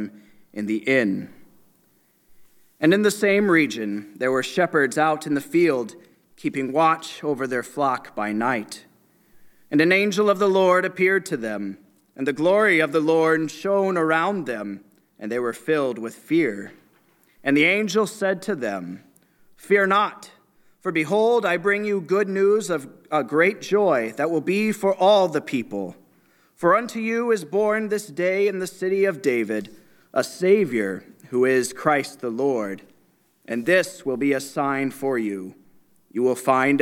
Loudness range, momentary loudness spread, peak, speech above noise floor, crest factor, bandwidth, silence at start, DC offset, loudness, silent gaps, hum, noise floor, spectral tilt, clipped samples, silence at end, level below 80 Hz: 4 LU; 13 LU; -4 dBFS; 41 dB; 18 dB; 16.5 kHz; 0 s; under 0.1%; -22 LUFS; none; none; -62 dBFS; -5 dB/octave; under 0.1%; 0 s; -74 dBFS